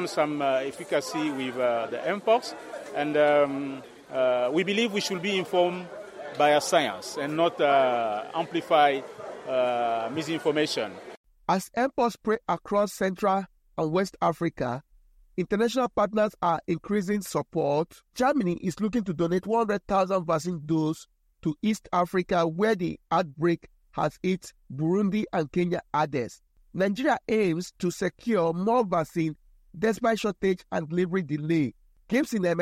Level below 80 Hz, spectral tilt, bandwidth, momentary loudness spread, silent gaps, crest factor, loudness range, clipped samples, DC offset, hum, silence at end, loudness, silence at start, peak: -60 dBFS; -5.5 dB/octave; 16 kHz; 9 LU; 11.17-11.24 s; 20 dB; 3 LU; under 0.1%; under 0.1%; none; 0 s; -27 LUFS; 0 s; -6 dBFS